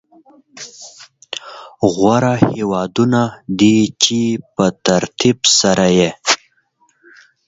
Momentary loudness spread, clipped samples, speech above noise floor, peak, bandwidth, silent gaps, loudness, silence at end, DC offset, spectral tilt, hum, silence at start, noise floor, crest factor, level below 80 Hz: 21 LU; under 0.1%; 45 dB; 0 dBFS; 8 kHz; none; -14 LUFS; 1.1 s; under 0.1%; -4 dB/octave; none; 0.55 s; -59 dBFS; 16 dB; -50 dBFS